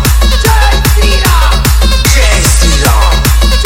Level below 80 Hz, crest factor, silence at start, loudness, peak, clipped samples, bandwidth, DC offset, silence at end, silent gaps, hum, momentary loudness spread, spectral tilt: -8 dBFS; 6 dB; 0 s; -8 LUFS; 0 dBFS; 0.6%; 17 kHz; under 0.1%; 0 s; none; none; 1 LU; -3.5 dB/octave